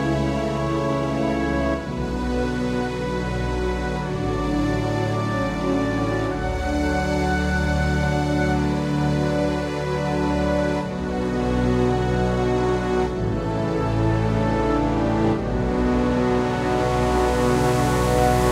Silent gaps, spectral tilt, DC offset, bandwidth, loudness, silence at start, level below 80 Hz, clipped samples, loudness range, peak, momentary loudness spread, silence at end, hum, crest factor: none; -6.5 dB/octave; under 0.1%; 15.5 kHz; -22 LUFS; 0 s; -30 dBFS; under 0.1%; 3 LU; -6 dBFS; 5 LU; 0 s; none; 16 dB